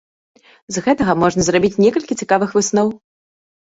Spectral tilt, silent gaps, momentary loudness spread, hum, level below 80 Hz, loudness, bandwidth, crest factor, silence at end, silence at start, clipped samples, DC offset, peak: -5 dB/octave; none; 7 LU; none; -48 dBFS; -16 LUFS; 8 kHz; 16 dB; 0.7 s; 0.7 s; under 0.1%; under 0.1%; -2 dBFS